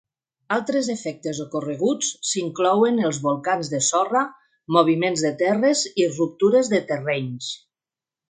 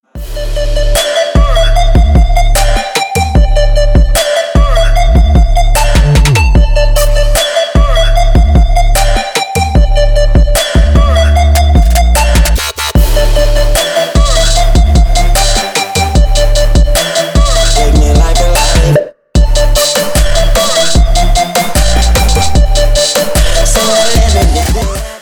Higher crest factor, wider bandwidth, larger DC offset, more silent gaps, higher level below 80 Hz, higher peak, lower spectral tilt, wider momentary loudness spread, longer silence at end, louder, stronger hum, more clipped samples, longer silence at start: first, 20 dB vs 6 dB; second, 9.6 kHz vs 20 kHz; neither; neither; second, -70 dBFS vs -8 dBFS; about the same, -2 dBFS vs 0 dBFS; about the same, -4 dB/octave vs -4 dB/octave; first, 10 LU vs 3 LU; first, 0.75 s vs 0 s; second, -22 LUFS vs -10 LUFS; neither; neither; first, 0.5 s vs 0.15 s